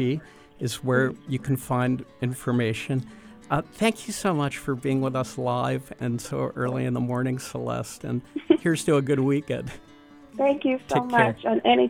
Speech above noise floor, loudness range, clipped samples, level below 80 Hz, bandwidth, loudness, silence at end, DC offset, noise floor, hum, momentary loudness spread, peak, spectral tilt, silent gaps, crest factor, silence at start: 24 dB; 3 LU; under 0.1%; -56 dBFS; 18.5 kHz; -26 LUFS; 0 s; under 0.1%; -49 dBFS; none; 10 LU; -6 dBFS; -6 dB/octave; none; 20 dB; 0 s